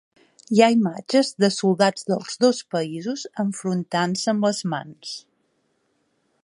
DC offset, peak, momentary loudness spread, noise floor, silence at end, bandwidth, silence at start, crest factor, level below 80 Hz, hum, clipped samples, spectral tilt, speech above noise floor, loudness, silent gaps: under 0.1%; -2 dBFS; 12 LU; -69 dBFS; 1.25 s; 11.5 kHz; 0.5 s; 20 dB; -72 dBFS; none; under 0.1%; -5 dB/octave; 47 dB; -22 LUFS; none